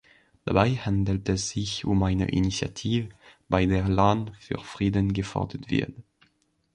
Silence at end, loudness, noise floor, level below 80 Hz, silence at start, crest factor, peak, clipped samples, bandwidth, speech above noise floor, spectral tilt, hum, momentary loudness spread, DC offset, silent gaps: 0.75 s; -26 LUFS; -69 dBFS; -42 dBFS; 0.45 s; 20 dB; -6 dBFS; under 0.1%; 9.8 kHz; 43 dB; -6 dB/octave; none; 10 LU; under 0.1%; none